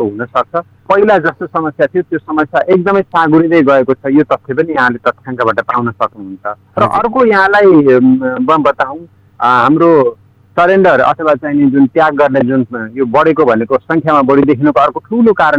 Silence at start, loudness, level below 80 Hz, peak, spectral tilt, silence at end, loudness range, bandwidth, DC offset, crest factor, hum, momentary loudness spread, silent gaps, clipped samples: 0 s; -10 LUFS; -48 dBFS; 0 dBFS; -8 dB/octave; 0 s; 3 LU; 7.6 kHz; under 0.1%; 10 dB; none; 9 LU; none; under 0.1%